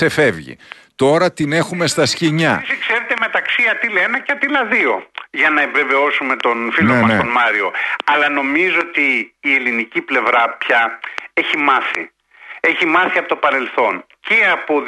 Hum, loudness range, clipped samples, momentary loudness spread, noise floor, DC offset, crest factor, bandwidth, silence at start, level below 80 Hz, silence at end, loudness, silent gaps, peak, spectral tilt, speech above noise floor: none; 2 LU; under 0.1%; 6 LU; -38 dBFS; under 0.1%; 14 dB; 12 kHz; 0 s; -58 dBFS; 0 s; -15 LUFS; none; -2 dBFS; -4.5 dB/octave; 22 dB